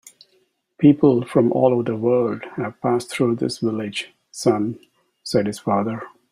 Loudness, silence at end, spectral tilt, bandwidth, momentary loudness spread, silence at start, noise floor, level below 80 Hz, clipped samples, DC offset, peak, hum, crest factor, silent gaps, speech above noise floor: -20 LUFS; 0.25 s; -6.5 dB/octave; 13 kHz; 12 LU; 0.8 s; -64 dBFS; -60 dBFS; under 0.1%; under 0.1%; -2 dBFS; none; 18 dB; none; 45 dB